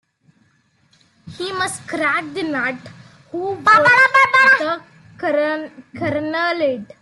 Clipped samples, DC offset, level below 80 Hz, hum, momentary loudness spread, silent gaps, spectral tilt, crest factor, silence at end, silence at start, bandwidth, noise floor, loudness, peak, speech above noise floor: under 0.1%; under 0.1%; -62 dBFS; none; 16 LU; none; -3.5 dB/octave; 16 dB; 0.2 s; 1.25 s; 12.5 kHz; -60 dBFS; -16 LUFS; -2 dBFS; 42 dB